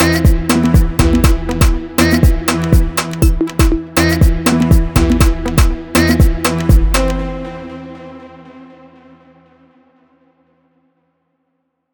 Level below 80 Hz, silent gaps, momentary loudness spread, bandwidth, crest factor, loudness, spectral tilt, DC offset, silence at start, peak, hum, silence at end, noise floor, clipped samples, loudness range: -16 dBFS; none; 14 LU; over 20 kHz; 14 dB; -13 LUFS; -5.5 dB/octave; under 0.1%; 0 s; 0 dBFS; none; 3.3 s; -68 dBFS; under 0.1%; 7 LU